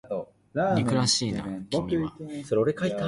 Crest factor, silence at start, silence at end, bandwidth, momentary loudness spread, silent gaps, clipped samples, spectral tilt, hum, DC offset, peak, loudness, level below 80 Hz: 16 dB; 0.05 s; 0 s; 11.5 kHz; 12 LU; none; under 0.1%; -4.5 dB/octave; none; under 0.1%; -10 dBFS; -27 LUFS; -54 dBFS